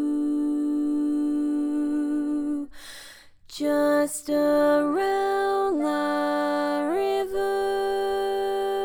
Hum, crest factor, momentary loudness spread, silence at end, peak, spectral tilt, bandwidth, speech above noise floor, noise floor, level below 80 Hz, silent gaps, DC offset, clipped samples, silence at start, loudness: none; 14 dB; 6 LU; 0 s; -10 dBFS; -4 dB/octave; 18.5 kHz; 25 dB; -48 dBFS; -56 dBFS; none; under 0.1%; under 0.1%; 0 s; -25 LUFS